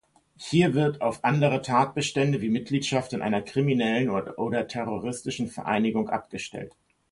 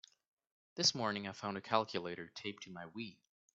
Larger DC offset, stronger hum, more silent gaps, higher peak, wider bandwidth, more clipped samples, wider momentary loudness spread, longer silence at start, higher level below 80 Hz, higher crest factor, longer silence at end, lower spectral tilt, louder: neither; neither; neither; first, -8 dBFS vs -16 dBFS; first, 11.5 kHz vs 8 kHz; neither; second, 9 LU vs 16 LU; second, 0.4 s vs 0.75 s; first, -62 dBFS vs -82 dBFS; second, 18 dB vs 26 dB; about the same, 0.45 s vs 0.4 s; first, -6 dB/octave vs -2 dB/octave; first, -26 LUFS vs -38 LUFS